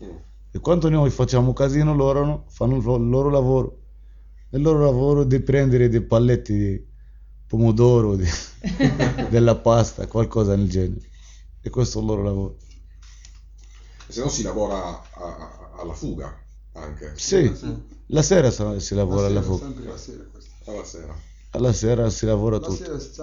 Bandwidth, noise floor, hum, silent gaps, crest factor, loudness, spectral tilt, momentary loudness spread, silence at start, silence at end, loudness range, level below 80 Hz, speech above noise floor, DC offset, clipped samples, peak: 7.6 kHz; -43 dBFS; none; none; 18 dB; -21 LUFS; -6.5 dB/octave; 19 LU; 0 s; 0 s; 10 LU; -34 dBFS; 23 dB; under 0.1%; under 0.1%; -4 dBFS